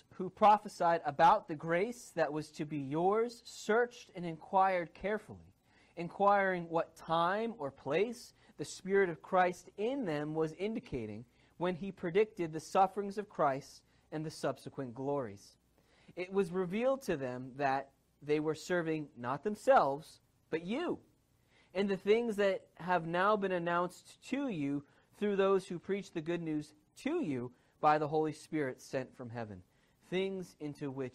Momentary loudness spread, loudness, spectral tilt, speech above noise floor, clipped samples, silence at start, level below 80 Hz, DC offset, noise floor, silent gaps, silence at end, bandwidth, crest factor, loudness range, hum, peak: 14 LU; -35 LUFS; -6 dB/octave; 36 dB; under 0.1%; 0.2 s; -70 dBFS; under 0.1%; -70 dBFS; none; 0.05 s; 15 kHz; 18 dB; 3 LU; none; -16 dBFS